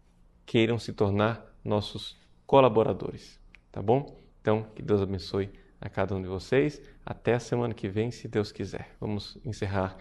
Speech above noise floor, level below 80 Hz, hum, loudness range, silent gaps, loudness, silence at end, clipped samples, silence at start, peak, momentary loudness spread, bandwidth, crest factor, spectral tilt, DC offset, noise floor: 27 dB; -54 dBFS; none; 4 LU; none; -29 LUFS; 0 s; under 0.1%; 0.45 s; -6 dBFS; 14 LU; 11.5 kHz; 24 dB; -7 dB/octave; under 0.1%; -55 dBFS